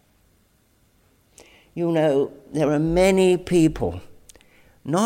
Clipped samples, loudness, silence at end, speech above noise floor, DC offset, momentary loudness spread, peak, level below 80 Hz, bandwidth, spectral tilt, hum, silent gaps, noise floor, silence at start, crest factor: under 0.1%; -21 LUFS; 0 s; 42 dB; under 0.1%; 15 LU; -6 dBFS; -44 dBFS; 16 kHz; -6.5 dB/octave; none; none; -61 dBFS; 1.75 s; 16 dB